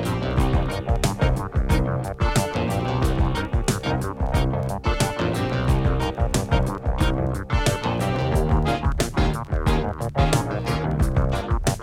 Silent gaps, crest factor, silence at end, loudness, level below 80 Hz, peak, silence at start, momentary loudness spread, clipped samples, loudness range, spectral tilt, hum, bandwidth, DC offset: none; 16 dB; 0 s; -23 LUFS; -26 dBFS; -6 dBFS; 0 s; 3 LU; under 0.1%; 1 LU; -6 dB/octave; none; 16.5 kHz; under 0.1%